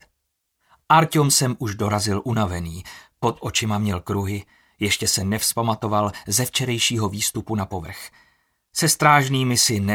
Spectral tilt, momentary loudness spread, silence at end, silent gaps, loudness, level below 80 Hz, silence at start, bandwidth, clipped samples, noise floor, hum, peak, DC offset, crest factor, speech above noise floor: -3.5 dB/octave; 13 LU; 0 s; none; -21 LUFS; -50 dBFS; 0.9 s; 18.5 kHz; under 0.1%; -75 dBFS; none; -2 dBFS; under 0.1%; 20 dB; 54 dB